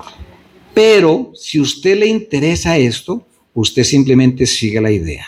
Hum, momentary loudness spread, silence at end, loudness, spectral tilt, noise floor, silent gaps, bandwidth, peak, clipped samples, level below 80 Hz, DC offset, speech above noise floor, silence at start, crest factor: none; 9 LU; 0 s; -13 LUFS; -5 dB/octave; -43 dBFS; none; 15 kHz; 0 dBFS; under 0.1%; -40 dBFS; under 0.1%; 31 dB; 0.05 s; 14 dB